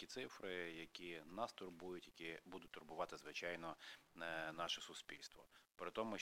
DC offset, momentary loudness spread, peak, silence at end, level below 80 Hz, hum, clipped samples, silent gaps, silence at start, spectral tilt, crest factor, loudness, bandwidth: under 0.1%; 10 LU; -30 dBFS; 0 s; -78 dBFS; none; under 0.1%; none; 0 s; -3 dB/octave; 22 dB; -50 LUFS; 16.5 kHz